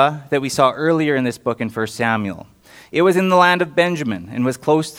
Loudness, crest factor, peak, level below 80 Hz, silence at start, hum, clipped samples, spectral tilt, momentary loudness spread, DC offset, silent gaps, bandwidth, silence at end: -18 LUFS; 18 dB; 0 dBFS; -60 dBFS; 0 s; none; under 0.1%; -5.5 dB/octave; 10 LU; under 0.1%; none; 16.5 kHz; 0 s